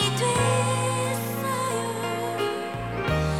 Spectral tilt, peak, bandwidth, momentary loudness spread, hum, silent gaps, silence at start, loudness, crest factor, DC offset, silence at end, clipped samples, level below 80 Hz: -4.5 dB/octave; -10 dBFS; 16.5 kHz; 6 LU; none; none; 0 s; -26 LUFS; 16 dB; 0.2%; 0 s; under 0.1%; -44 dBFS